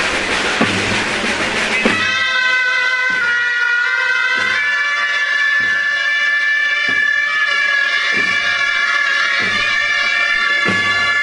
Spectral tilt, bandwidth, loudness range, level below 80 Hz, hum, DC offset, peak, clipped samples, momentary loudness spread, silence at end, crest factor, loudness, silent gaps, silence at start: -2 dB/octave; 11.5 kHz; 1 LU; -48 dBFS; none; under 0.1%; 0 dBFS; under 0.1%; 2 LU; 0 s; 14 dB; -14 LUFS; none; 0 s